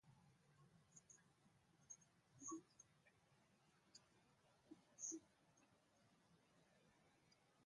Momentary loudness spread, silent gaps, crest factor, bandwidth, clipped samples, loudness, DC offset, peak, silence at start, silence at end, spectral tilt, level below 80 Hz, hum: 15 LU; none; 24 dB; 11 kHz; under 0.1%; -56 LUFS; under 0.1%; -40 dBFS; 0.05 s; 0 s; -3 dB/octave; under -90 dBFS; none